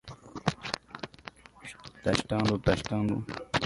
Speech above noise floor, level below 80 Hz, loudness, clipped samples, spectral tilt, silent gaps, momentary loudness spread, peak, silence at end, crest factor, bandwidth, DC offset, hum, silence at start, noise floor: 21 dB; -50 dBFS; -31 LUFS; under 0.1%; -5.5 dB/octave; none; 19 LU; -6 dBFS; 0 s; 26 dB; 11.5 kHz; under 0.1%; none; 0.05 s; -50 dBFS